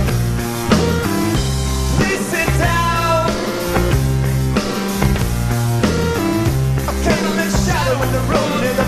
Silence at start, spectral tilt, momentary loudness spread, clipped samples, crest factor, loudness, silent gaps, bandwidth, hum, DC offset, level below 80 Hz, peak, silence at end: 0 s; -5.5 dB/octave; 3 LU; under 0.1%; 16 dB; -17 LUFS; none; 14.5 kHz; none; under 0.1%; -24 dBFS; 0 dBFS; 0 s